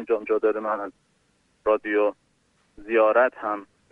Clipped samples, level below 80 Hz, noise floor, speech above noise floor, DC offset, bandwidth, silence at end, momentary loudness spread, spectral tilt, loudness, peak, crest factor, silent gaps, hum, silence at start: under 0.1%; -64 dBFS; -66 dBFS; 43 dB; under 0.1%; 4.6 kHz; 0.25 s; 11 LU; -6.5 dB/octave; -24 LUFS; -8 dBFS; 18 dB; none; none; 0 s